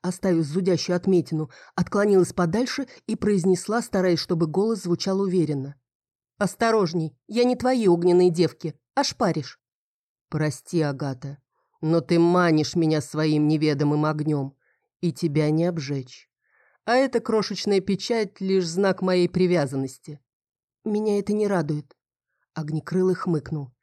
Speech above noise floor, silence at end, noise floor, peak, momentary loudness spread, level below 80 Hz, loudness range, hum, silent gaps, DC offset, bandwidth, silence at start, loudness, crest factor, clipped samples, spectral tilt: 56 dB; 0.15 s; -79 dBFS; -8 dBFS; 11 LU; -60 dBFS; 4 LU; none; 5.95-6.00 s, 6.15-6.19 s, 9.72-10.15 s, 10.21-10.25 s, 20.33-20.40 s, 20.64-20.68 s; under 0.1%; 13 kHz; 0.05 s; -23 LUFS; 14 dB; under 0.1%; -6.5 dB/octave